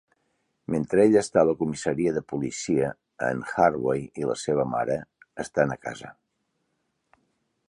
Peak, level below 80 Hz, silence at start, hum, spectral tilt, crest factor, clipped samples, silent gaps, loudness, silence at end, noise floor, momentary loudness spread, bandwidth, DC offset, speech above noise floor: -6 dBFS; -58 dBFS; 0.7 s; none; -6 dB/octave; 20 dB; under 0.1%; none; -25 LUFS; 1.55 s; -76 dBFS; 15 LU; 11 kHz; under 0.1%; 51 dB